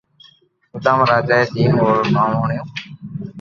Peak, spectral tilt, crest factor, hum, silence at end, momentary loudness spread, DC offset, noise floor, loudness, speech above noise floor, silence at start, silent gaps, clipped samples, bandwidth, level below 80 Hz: -2 dBFS; -7.5 dB/octave; 16 dB; none; 0 s; 16 LU; under 0.1%; -52 dBFS; -16 LUFS; 36 dB; 0.75 s; none; under 0.1%; 7.2 kHz; -52 dBFS